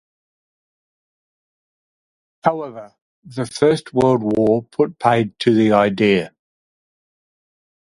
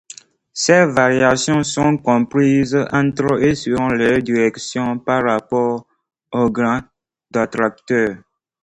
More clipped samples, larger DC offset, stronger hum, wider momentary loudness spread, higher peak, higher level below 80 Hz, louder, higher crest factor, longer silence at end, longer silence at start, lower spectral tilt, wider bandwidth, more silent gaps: neither; neither; neither; first, 14 LU vs 8 LU; about the same, 0 dBFS vs 0 dBFS; second, -56 dBFS vs -48 dBFS; about the same, -17 LUFS vs -17 LUFS; about the same, 20 dB vs 16 dB; first, 1.65 s vs 0.45 s; first, 2.45 s vs 0.55 s; first, -6.5 dB/octave vs -5 dB/octave; about the same, 11.5 kHz vs 11 kHz; first, 3.02-3.22 s vs none